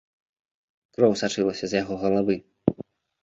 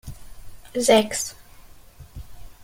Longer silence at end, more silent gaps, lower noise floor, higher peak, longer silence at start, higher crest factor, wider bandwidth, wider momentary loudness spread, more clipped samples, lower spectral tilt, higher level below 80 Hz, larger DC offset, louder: first, 0.4 s vs 0 s; neither; about the same, -44 dBFS vs -46 dBFS; about the same, -2 dBFS vs -4 dBFS; first, 1 s vs 0.05 s; about the same, 24 dB vs 22 dB; second, 8 kHz vs 16.5 kHz; second, 16 LU vs 26 LU; neither; first, -5.5 dB/octave vs -3 dB/octave; second, -58 dBFS vs -46 dBFS; neither; second, -25 LUFS vs -21 LUFS